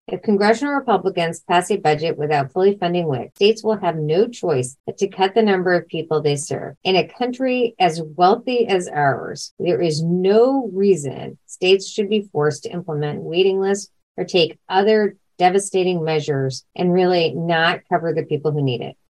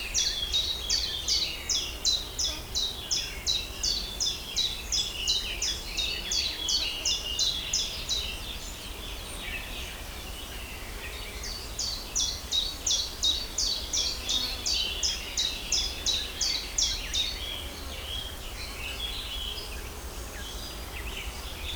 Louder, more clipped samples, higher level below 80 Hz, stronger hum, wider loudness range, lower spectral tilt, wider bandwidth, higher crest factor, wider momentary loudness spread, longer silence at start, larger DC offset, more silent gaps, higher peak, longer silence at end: first, -19 LUFS vs -29 LUFS; neither; second, -66 dBFS vs -42 dBFS; neither; second, 2 LU vs 8 LU; first, -5.5 dB/octave vs -0.5 dB/octave; second, 12 kHz vs over 20 kHz; about the same, 16 dB vs 18 dB; second, 8 LU vs 11 LU; about the same, 0.1 s vs 0 s; neither; first, 4.80-4.84 s, 6.77-6.81 s, 9.51-9.57 s, 14.03-14.15 s vs none; first, -2 dBFS vs -14 dBFS; first, 0.15 s vs 0 s